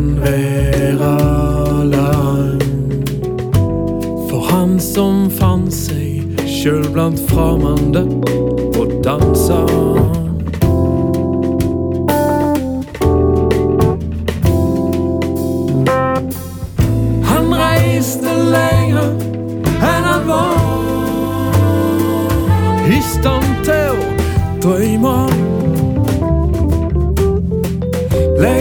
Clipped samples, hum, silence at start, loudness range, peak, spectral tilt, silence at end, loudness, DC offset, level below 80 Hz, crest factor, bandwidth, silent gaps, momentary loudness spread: under 0.1%; none; 0 s; 1 LU; 0 dBFS; -7 dB/octave; 0 s; -14 LUFS; under 0.1%; -24 dBFS; 14 dB; over 20 kHz; none; 5 LU